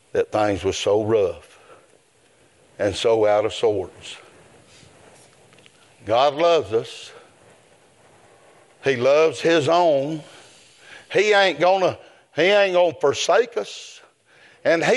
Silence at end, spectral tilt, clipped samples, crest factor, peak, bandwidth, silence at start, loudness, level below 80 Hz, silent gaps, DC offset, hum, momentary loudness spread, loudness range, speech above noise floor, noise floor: 0 s; -4 dB/octave; under 0.1%; 18 dB; -4 dBFS; 11.5 kHz; 0.15 s; -20 LUFS; -62 dBFS; none; under 0.1%; none; 19 LU; 5 LU; 38 dB; -57 dBFS